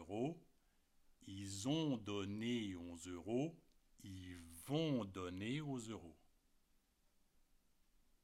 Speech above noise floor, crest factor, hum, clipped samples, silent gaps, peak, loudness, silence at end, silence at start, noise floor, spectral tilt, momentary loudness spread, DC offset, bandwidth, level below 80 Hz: 33 dB; 20 dB; none; under 0.1%; none; -28 dBFS; -45 LUFS; 2.1 s; 0 s; -77 dBFS; -5.5 dB/octave; 15 LU; under 0.1%; 16 kHz; -76 dBFS